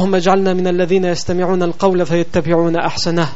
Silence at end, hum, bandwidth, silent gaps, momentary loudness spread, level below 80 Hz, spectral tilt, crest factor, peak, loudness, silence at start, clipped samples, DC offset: 0 s; none; 8 kHz; none; 3 LU; -46 dBFS; -5.5 dB/octave; 14 dB; 0 dBFS; -15 LUFS; 0 s; under 0.1%; 8%